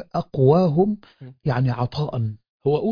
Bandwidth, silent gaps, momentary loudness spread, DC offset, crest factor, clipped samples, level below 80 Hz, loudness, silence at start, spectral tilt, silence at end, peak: 5.2 kHz; 2.49-2.60 s; 12 LU; under 0.1%; 16 dB; under 0.1%; -52 dBFS; -22 LUFS; 0 s; -10 dB/octave; 0 s; -4 dBFS